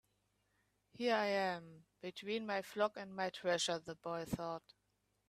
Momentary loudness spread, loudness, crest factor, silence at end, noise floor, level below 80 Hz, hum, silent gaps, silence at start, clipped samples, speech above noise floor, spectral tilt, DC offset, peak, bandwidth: 12 LU; -40 LUFS; 20 dB; 0.7 s; -82 dBFS; -74 dBFS; 50 Hz at -70 dBFS; none; 1 s; under 0.1%; 42 dB; -3.5 dB/octave; under 0.1%; -22 dBFS; 14.5 kHz